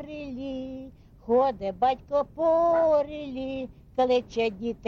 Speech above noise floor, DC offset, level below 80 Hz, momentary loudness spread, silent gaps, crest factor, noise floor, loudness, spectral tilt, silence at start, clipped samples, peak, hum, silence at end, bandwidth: 20 dB; under 0.1%; -54 dBFS; 15 LU; none; 12 dB; -45 dBFS; -26 LUFS; -6.5 dB/octave; 0 s; under 0.1%; -14 dBFS; none; 0 s; 7.2 kHz